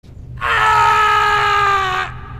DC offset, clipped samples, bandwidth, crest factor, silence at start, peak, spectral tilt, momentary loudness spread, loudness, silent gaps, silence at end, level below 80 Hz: under 0.1%; under 0.1%; 15.5 kHz; 12 dB; 0.05 s; -2 dBFS; -2.5 dB/octave; 8 LU; -14 LUFS; none; 0 s; -36 dBFS